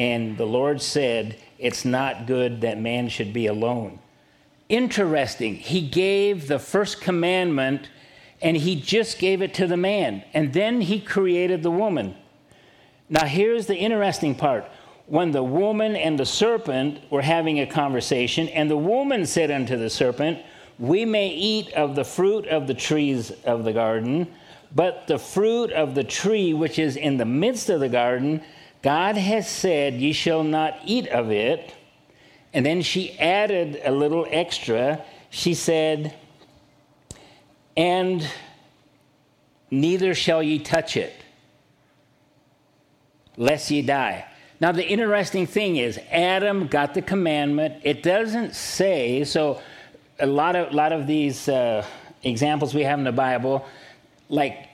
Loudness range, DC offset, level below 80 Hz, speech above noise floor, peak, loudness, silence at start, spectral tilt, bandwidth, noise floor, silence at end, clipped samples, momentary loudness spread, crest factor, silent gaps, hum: 3 LU; under 0.1%; -60 dBFS; 39 dB; -4 dBFS; -23 LUFS; 0 s; -5 dB/octave; 15.5 kHz; -61 dBFS; 0.1 s; under 0.1%; 6 LU; 20 dB; none; none